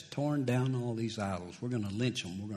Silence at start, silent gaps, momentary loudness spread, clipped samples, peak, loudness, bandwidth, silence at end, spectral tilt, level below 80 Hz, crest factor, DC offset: 0 s; none; 7 LU; under 0.1%; -20 dBFS; -34 LUFS; 13 kHz; 0 s; -6 dB/octave; -68 dBFS; 14 dB; under 0.1%